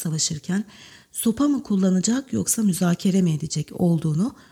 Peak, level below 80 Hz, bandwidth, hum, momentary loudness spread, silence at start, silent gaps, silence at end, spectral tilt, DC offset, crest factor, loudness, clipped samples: -8 dBFS; -56 dBFS; 16.5 kHz; none; 7 LU; 0 s; none; 0.15 s; -5.5 dB/octave; under 0.1%; 14 dB; -22 LUFS; under 0.1%